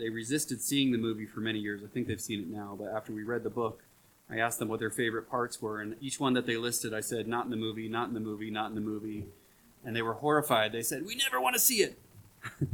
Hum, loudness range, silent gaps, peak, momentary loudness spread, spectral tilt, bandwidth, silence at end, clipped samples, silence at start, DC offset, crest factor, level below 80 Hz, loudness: none; 6 LU; none; -8 dBFS; 11 LU; -3.5 dB/octave; 19 kHz; 0 s; under 0.1%; 0 s; under 0.1%; 24 dB; -66 dBFS; -32 LUFS